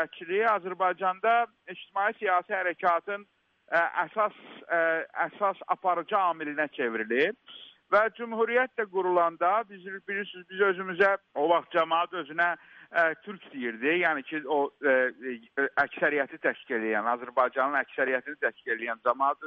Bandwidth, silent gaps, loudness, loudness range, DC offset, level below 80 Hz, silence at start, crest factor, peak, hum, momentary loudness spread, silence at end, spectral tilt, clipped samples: 6.4 kHz; none; -28 LUFS; 1 LU; under 0.1%; -78 dBFS; 0 s; 18 dB; -10 dBFS; none; 9 LU; 0 s; -6.5 dB/octave; under 0.1%